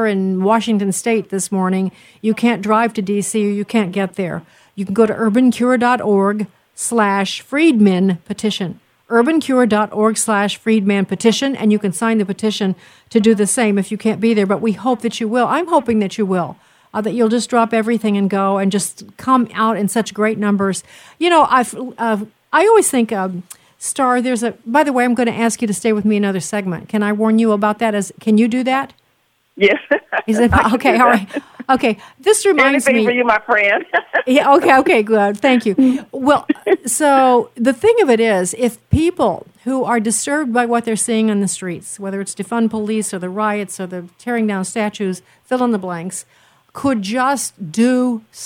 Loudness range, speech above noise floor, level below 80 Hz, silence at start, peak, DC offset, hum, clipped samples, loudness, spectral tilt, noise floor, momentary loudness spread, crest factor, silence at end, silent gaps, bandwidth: 5 LU; 46 dB; -46 dBFS; 0 s; 0 dBFS; under 0.1%; none; under 0.1%; -16 LUFS; -4.5 dB/octave; -61 dBFS; 10 LU; 14 dB; 0 s; none; 16 kHz